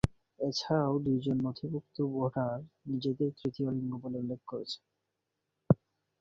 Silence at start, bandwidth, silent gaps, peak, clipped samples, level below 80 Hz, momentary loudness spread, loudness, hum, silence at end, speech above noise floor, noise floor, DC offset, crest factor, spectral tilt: 0.05 s; 10.5 kHz; none; -8 dBFS; under 0.1%; -56 dBFS; 9 LU; -34 LUFS; none; 0.45 s; 51 dB; -85 dBFS; under 0.1%; 26 dB; -7.5 dB/octave